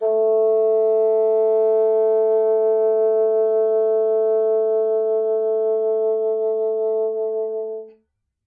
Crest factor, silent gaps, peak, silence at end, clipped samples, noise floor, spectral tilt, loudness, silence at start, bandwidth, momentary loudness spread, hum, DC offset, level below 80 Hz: 8 dB; none; -10 dBFS; 0.55 s; under 0.1%; -68 dBFS; -8.5 dB/octave; -19 LUFS; 0 s; 2.3 kHz; 5 LU; none; under 0.1%; -76 dBFS